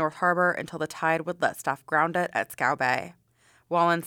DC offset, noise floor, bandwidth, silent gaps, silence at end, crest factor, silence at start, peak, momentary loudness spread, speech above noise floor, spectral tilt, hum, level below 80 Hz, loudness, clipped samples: under 0.1%; -63 dBFS; 19.5 kHz; none; 0 s; 18 dB; 0 s; -10 dBFS; 8 LU; 37 dB; -5 dB/octave; none; -72 dBFS; -26 LUFS; under 0.1%